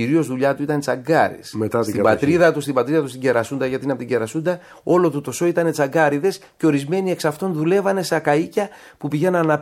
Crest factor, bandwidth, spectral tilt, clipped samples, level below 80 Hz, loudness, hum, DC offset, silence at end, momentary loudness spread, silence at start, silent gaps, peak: 18 dB; 16 kHz; -6 dB/octave; under 0.1%; -60 dBFS; -20 LUFS; none; under 0.1%; 0 s; 7 LU; 0 s; none; -2 dBFS